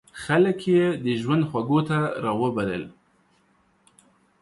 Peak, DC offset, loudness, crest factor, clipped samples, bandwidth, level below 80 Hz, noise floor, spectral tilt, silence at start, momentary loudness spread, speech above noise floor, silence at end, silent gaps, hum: -8 dBFS; under 0.1%; -23 LUFS; 16 dB; under 0.1%; 11.5 kHz; -60 dBFS; -64 dBFS; -7.5 dB/octave; 0.15 s; 7 LU; 41 dB; 1.5 s; none; none